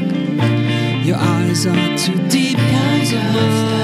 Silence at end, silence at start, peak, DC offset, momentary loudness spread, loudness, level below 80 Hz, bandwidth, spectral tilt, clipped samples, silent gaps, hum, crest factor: 0 s; 0 s; -2 dBFS; under 0.1%; 2 LU; -16 LUFS; -54 dBFS; 14.5 kHz; -5.5 dB/octave; under 0.1%; none; none; 14 dB